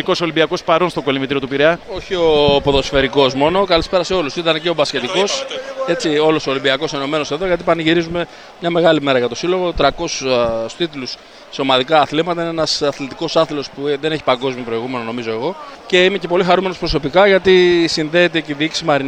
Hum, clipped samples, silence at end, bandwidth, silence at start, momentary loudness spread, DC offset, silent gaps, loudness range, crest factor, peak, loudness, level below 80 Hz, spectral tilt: none; under 0.1%; 0 s; 10 kHz; 0 s; 10 LU; under 0.1%; none; 3 LU; 14 dB; -2 dBFS; -16 LUFS; -38 dBFS; -4.5 dB/octave